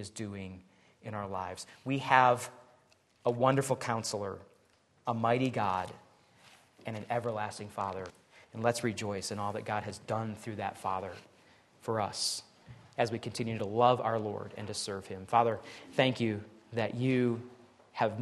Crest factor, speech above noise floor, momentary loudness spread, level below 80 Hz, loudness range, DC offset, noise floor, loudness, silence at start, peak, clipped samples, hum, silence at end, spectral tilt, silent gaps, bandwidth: 26 dB; 35 dB; 15 LU; -72 dBFS; 6 LU; under 0.1%; -68 dBFS; -33 LUFS; 0 s; -8 dBFS; under 0.1%; none; 0 s; -5 dB/octave; none; 12.5 kHz